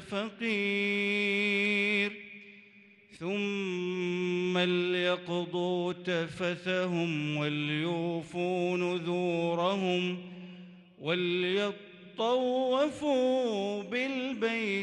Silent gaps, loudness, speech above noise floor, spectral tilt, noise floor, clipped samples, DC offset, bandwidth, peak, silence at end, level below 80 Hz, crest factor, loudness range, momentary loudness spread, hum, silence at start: none; -30 LUFS; 27 dB; -5.5 dB/octave; -58 dBFS; under 0.1%; under 0.1%; 10.5 kHz; -16 dBFS; 0 s; -74 dBFS; 14 dB; 2 LU; 8 LU; none; 0 s